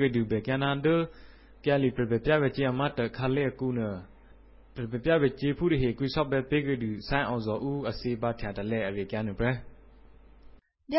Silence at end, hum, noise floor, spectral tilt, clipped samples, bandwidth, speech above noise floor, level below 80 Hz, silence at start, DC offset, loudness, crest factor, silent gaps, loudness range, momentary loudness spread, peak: 0 s; none; -54 dBFS; -11 dB/octave; under 0.1%; 5.8 kHz; 26 dB; -48 dBFS; 0 s; under 0.1%; -29 LUFS; 16 dB; none; 4 LU; 8 LU; -12 dBFS